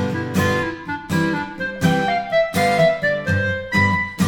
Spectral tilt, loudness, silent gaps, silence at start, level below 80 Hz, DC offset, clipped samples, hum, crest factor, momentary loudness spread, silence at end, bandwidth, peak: -5.5 dB/octave; -19 LUFS; none; 0 s; -46 dBFS; under 0.1%; under 0.1%; none; 16 dB; 7 LU; 0 s; 18.5 kHz; -4 dBFS